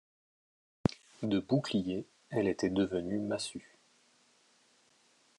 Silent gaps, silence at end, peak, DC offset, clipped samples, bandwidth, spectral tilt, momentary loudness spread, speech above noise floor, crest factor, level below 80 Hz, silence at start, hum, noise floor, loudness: none; 1.75 s; -10 dBFS; under 0.1%; under 0.1%; 11.5 kHz; -6 dB/octave; 9 LU; 36 dB; 26 dB; -68 dBFS; 0.9 s; none; -68 dBFS; -34 LUFS